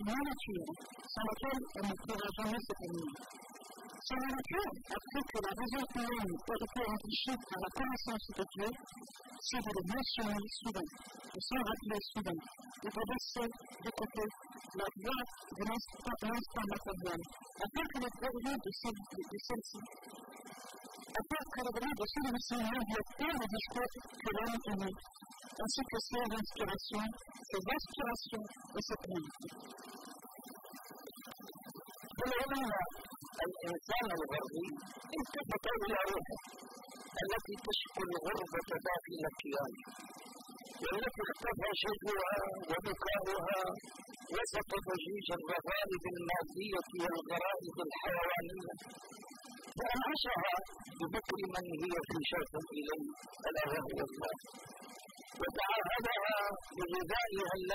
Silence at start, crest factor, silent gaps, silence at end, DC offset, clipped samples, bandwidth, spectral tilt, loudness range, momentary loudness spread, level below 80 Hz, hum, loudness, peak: 0 s; 18 dB; none; 0 s; under 0.1%; under 0.1%; 16 kHz; -4 dB/octave; 4 LU; 15 LU; -60 dBFS; none; -40 LUFS; -22 dBFS